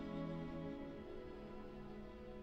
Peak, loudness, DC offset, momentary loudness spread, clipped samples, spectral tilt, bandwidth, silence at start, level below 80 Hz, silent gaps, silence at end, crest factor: -34 dBFS; -50 LUFS; under 0.1%; 8 LU; under 0.1%; -8.5 dB/octave; 8 kHz; 0 s; -60 dBFS; none; 0 s; 14 dB